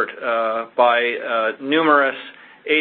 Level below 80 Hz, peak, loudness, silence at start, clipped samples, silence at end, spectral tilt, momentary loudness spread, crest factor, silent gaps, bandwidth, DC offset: -68 dBFS; -2 dBFS; -18 LUFS; 0 s; under 0.1%; 0 s; -8.5 dB/octave; 14 LU; 18 dB; none; 4.4 kHz; under 0.1%